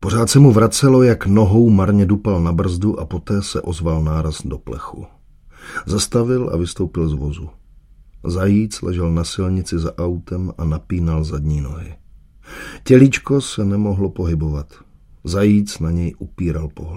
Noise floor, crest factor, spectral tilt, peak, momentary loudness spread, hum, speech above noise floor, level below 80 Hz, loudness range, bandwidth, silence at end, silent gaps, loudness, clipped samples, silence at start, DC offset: -46 dBFS; 16 dB; -6.5 dB/octave; 0 dBFS; 17 LU; none; 29 dB; -32 dBFS; 7 LU; 15.5 kHz; 0 s; none; -17 LUFS; under 0.1%; 0 s; under 0.1%